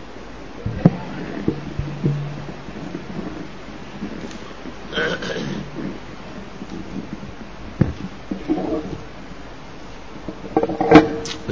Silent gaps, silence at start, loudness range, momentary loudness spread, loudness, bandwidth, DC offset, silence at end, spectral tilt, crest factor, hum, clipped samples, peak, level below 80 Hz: none; 0 s; 9 LU; 18 LU; -23 LUFS; 8 kHz; 1%; 0 s; -6.5 dB/octave; 24 dB; none; under 0.1%; 0 dBFS; -40 dBFS